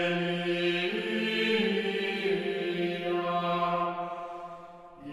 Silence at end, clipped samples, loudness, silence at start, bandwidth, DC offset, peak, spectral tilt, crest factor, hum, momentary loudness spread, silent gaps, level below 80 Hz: 0 s; under 0.1%; -29 LUFS; 0 s; 12.5 kHz; under 0.1%; -14 dBFS; -6 dB/octave; 16 dB; none; 14 LU; none; -72 dBFS